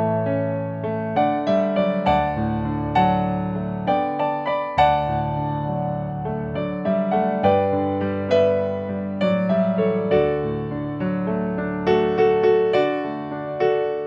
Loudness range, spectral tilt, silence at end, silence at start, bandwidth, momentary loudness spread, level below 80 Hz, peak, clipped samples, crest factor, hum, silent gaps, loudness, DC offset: 2 LU; -9 dB/octave; 0 s; 0 s; 7 kHz; 8 LU; -44 dBFS; -4 dBFS; under 0.1%; 16 dB; none; none; -22 LUFS; under 0.1%